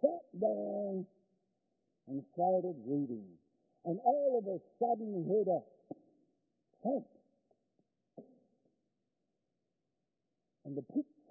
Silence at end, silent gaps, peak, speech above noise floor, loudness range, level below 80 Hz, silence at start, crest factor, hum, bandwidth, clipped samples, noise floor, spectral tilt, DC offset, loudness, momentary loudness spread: 0.25 s; none; -16 dBFS; 52 dB; 11 LU; under -90 dBFS; 0.05 s; 22 dB; none; 0.9 kHz; under 0.1%; -87 dBFS; 0.5 dB/octave; under 0.1%; -37 LUFS; 14 LU